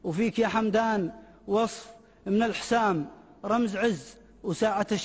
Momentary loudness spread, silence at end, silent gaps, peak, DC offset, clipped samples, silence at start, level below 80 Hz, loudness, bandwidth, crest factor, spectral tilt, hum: 14 LU; 0 s; none; -14 dBFS; under 0.1%; under 0.1%; 0.05 s; -58 dBFS; -27 LUFS; 8 kHz; 14 dB; -5.5 dB/octave; none